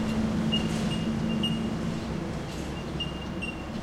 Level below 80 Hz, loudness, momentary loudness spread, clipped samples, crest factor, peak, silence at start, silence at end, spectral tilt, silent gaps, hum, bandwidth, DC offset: -42 dBFS; -30 LUFS; 7 LU; under 0.1%; 14 dB; -14 dBFS; 0 s; 0 s; -5.5 dB/octave; none; none; 14 kHz; under 0.1%